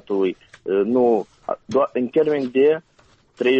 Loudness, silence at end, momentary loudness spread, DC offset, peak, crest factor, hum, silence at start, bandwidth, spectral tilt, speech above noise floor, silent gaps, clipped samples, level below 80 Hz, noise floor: -20 LUFS; 0 s; 9 LU; under 0.1%; -6 dBFS; 14 dB; none; 0.1 s; 7.4 kHz; -7 dB/octave; 37 dB; none; under 0.1%; -62 dBFS; -56 dBFS